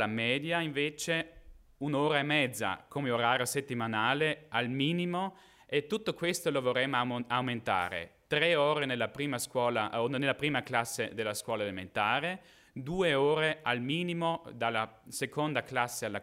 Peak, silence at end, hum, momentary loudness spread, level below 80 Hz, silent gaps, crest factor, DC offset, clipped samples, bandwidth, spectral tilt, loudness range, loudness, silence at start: -12 dBFS; 0 s; none; 8 LU; -66 dBFS; none; 20 dB; under 0.1%; under 0.1%; 16 kHz; -4 dB/octave; 2 LU; -31 LUFS; 0 s